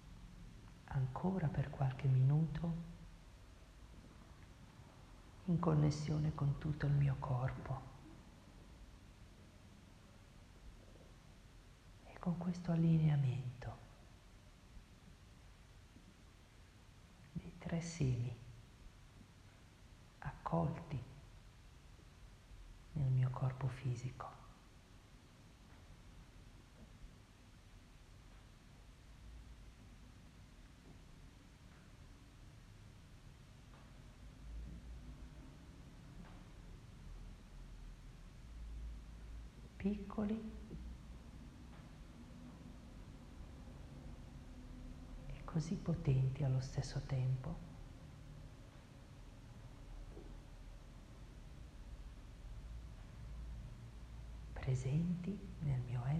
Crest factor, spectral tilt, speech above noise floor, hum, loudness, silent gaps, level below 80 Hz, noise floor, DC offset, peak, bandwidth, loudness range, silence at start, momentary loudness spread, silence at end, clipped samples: 22 dB; -8 dB/octave; 24 dB; none; -41 LUFS; none; -56 dBFS; -62 dBFS; under 0.1%; -22 dBFS; 10 kHz; 21 LU; 0 s; 24 LU; 0 s; under 0.1%